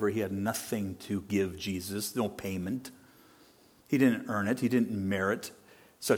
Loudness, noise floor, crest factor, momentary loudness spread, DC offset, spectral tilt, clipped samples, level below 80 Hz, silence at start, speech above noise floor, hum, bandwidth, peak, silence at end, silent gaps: -32 LUFS; -60 dBFS; 20 dB; 10 LU; under 0.1%; -5.5 dB/octave; under 0.1%; -66 dBFS; 0 s; 30 dB; none; 18 kHz; -12 dBFS; 0 s; none